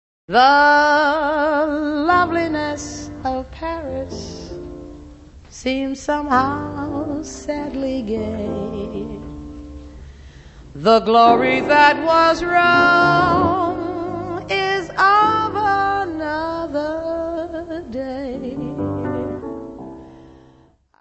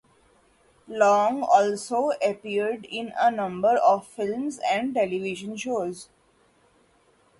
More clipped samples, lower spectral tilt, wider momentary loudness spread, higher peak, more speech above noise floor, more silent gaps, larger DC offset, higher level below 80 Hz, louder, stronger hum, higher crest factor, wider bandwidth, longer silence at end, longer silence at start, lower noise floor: neither; about the same, -5 dB/octave vs -4.5 dB/octave; first, 19 LU vs 12 LU; first, -2 dBFS vs -6 dBFS; about the same, 37 dB vs 38 dB; neither; neither; first, -42 dBFS vs -68 dBFS; first, -18 LUFS vs -24 LUFS; neither; about the same, 18 dB vs 20 dB; second, 8.4 kHz vs 11.5 kHz; second, 0.7 s vs 1.35 s; second, 0.3 s vs 0.9 s; second, -53 dBFS vs -62 dBFS